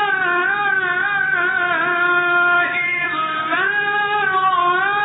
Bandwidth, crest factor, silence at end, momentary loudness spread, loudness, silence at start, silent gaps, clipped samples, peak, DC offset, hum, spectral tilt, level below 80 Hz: 4 kHz; 10 dB; 0 s; 3 LU; -17 LUFS; 0 s; none; under 0.1%; -8 dBFS; under 0.1%; none; 0 dB/octave; -66 dBFS